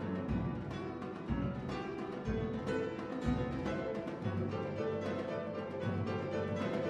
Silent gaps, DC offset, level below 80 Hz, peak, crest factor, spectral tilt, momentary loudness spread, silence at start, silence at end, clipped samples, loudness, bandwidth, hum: none; under 0.1%; -52 dBFS; -20 dBFS; 18 dB; -8 dB/octave; 4 LU; 0 s; 0 s; under 0.1%; -38 LUFS; 9.4 kHz; none